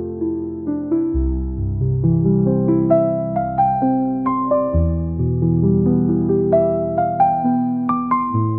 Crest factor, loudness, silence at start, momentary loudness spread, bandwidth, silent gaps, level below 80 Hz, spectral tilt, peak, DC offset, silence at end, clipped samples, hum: 14 dB; -18 LUFS; 0 s; 6 LU; 2.6 kHz; none; -30 dBFS; -12.5 dB/octave; -4 dBFS; 0.2%; 0 s; under 0.1%; none